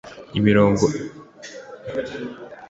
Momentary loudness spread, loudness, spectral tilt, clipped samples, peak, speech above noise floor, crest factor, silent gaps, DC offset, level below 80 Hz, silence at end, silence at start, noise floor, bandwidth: 22 LU; -21 LUFS; -6.5 dB/octave; under 0.1%; -4 dBFS; 20 dB; 18 dB; none; under 0.1%; -48 dBFS; 0.05 s; 0.05 s; -40 dBFS; 8 kHz